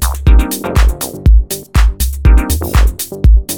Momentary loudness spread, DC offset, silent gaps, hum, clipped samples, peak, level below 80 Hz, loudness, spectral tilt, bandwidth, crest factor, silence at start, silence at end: 4 LU; under 0.1%; none; none; under 0.1%; 0 dBFS; -10 dBFS; -13 LUFS; -5 dB/octave; over 20 kHz; 10 dB; 0 s; 0 s